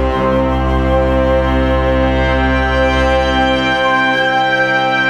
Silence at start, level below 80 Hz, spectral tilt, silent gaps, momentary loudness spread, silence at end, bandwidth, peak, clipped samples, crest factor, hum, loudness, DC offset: 0 s; -20 dBFS; -6 dB/octave; none; 2 LU; 0 s; 9.2 kHz; -2 dBFS; under 0.1%; 10 dB; none; -13 LUFS; under 0.1%